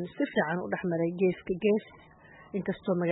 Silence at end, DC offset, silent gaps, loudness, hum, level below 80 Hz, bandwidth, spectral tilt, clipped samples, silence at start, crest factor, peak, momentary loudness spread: 0 s; under 0.1%; none; -30 LUFS; none; -64 dBFS; 4 kHz; -11 dB/octave; under 0.1%; 0 s; 16 dB; -14 dBFS; 6 LU